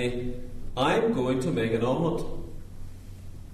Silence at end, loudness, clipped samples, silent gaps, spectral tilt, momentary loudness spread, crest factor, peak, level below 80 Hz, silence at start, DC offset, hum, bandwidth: 0 s; -27 LUFS; under 0.1%; none; -6.5 dB/octave; 21 LU; 18 dB; -10 dBFS; -40 dBFS; 0 s; under 0.1%; none; 13.5 kHz